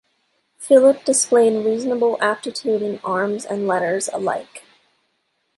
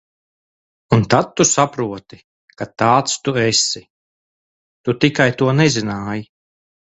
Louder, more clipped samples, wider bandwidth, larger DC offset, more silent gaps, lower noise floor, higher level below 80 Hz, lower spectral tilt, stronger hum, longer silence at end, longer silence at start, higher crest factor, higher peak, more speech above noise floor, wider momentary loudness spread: second, -19 LUFS vs -16 LUFS; neither; first, 11.5 kHz vs 8.4 kHz; neither; second, none vs 2.24-2.48 s, 3.90-4.84 s; second, -70 dBFS vs under -90 dBFS; second, -72 dBFS vs -50 dBFS; about the same, -3.5 dB/octave vs -4 dB/octave; neither; first, 1 s vs 0.7 s; second, 0.6 s vs 0.9 s; about the same, 18 dB vs 18 dB; about the same, -2 dBFS vs 0 dBFS; second, 52 dB vs over 73 dB; second, 10 LU vs 13 LU